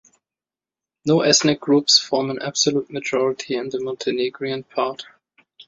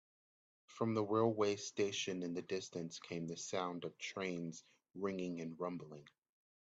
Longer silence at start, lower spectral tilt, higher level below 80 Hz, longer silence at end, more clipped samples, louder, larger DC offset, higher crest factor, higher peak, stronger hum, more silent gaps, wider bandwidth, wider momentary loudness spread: first, 1.05 s vs 0.7 s; second, -3 dB/octave vs -4.5 dB/octave; first, -64 dBFS vs -82 dBFS; about the same, 0.65 s vs 0.6 s; neither; first, -20 LUFS vs -41 LUFS; neither; about the same, 20 dB vs 20 dB; first, -2 dBFS vs -22 dBFS; neither; neither; about the same, 7.8 kHz vs 8.2 kHz; second, 11 LU vs 14 LU